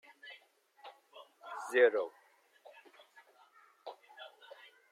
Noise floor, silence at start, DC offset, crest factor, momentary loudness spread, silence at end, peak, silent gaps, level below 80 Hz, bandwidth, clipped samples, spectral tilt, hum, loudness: -65 dBFS; 0.25 s; under 0.1%; 24 dB; 29 LU; 0.65 s; -14 dBFS; none; under -90 dBFS; 13.5 kHz; under 0.1%; -1.5 dB/octave; none; -32 LUFS